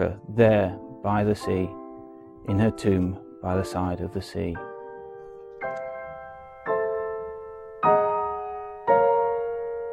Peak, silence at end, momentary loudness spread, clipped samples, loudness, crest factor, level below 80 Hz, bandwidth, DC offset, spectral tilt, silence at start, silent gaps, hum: -6 dBFS; 0 s; 20 LU; under 0.1%; -26 LUFS; 20 dB; -54 dBFS; 16.5 kHz; under 0.1%; -8 dB/octave; 0 s; none; none